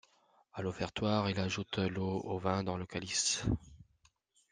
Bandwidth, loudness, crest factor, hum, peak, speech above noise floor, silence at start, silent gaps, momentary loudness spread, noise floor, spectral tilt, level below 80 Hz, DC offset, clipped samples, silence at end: 10 kHz; -35 LUFS; 20 dB; none; -16 dBFS; 37 dB; 0.55 s; none; 8 LU; -72 dBFS; -4 dB/octave; -56 dBFS; under 0.1%; under 0.1%; 0.7 s